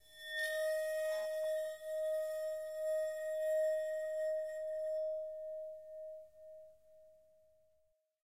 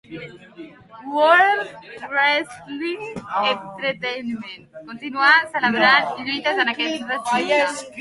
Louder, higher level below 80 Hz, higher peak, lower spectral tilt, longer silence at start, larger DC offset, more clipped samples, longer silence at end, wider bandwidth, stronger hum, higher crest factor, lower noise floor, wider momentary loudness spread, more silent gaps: second, -39 LUFS vs -19 LUFS; second, -82 dBFS vs -66 dBFS; second, -28 dBFS vs -2 dBFS; second, 0.5 dB/octave vs -3 dB/octave; about the same, 0.1 s vs 0.1 s; neither; neither; first, 1.1 s vs 0 s; first, 16 kHz vs 11.5 kHz; neither; second, 12 dB vs 20 dB; first, -78 dBFS vs -41 dBFS; second, 14 LU vs 21 LU; neither